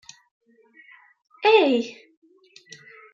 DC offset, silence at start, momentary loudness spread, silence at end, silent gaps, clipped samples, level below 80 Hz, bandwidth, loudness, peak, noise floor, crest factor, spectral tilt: under 0.1%; 1.4 s; 28 LU; 1.25 s; none; under 0.1%; -84 dBFS; 7.4 kHz; -19 LUFS; -6 dBFS; -54 dBFS; 20 dB; -3.5 dB/octave